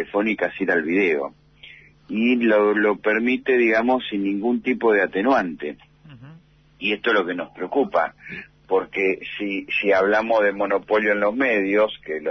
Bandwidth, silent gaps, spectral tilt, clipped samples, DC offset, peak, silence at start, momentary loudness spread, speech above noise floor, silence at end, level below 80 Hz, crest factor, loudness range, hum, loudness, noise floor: 6.2 kHz; none; -6.5 dB/octave; under 0.1%; under 0.1%; -8 dBFS; 0 s; 10 LU; 29 dB; 0 s; -60 dBFS; 14 dB; 4 LU; none; -21 LUFS; -50 dBFS